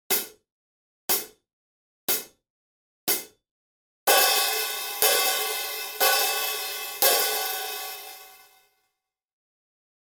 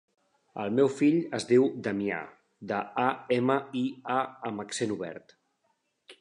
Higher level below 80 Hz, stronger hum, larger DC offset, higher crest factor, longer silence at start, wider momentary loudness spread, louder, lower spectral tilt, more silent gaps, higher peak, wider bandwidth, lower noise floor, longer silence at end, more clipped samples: about the same, -74 dBFS vs -74 dBFS; neither; neither; first, 26 dB vs 20 dB; second, 0.1 s vs 0.55 s; about the same, 15 LU vs 13 LU; first, -23 LUFS vs -29 LUFS; second, 1.5 dB/octave vs -5.5 dB/octave; first, 0.52-1.08 s, 1.53-2.08 s, 2.50-3.07 s, 3.51-4.07 s vs none; first, -2 dBFS vs -10 dBFS; first, over 20 kHz vs 11 kHz; first, -81 dBFS vs -75 dBFS; first, 1.7 s vs 0.05 s; neither